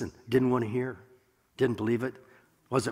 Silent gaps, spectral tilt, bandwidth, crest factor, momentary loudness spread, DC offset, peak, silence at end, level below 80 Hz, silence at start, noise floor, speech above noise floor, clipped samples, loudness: none; -6.5 dB/octave; 15.5 kHz; 18 dB; 11 LU; under 0.1%; -12 dBFS; 0 s; -62 dBFS; 0 s; -59 dBFS; 30 dB; under 0.1%; -30 LUFS